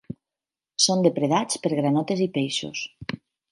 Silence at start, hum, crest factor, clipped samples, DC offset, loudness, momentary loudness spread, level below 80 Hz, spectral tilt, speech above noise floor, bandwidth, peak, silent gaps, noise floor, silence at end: 0.1 s; none; 20 dB; under 0.1%; under 0.1%; -23 LUFS; 16 LU; -64 dBFS; -4 dB/octave; over 66 dB; 11.5 kHz; -6 dBFS; none; under -90 dBFS; 0.35 s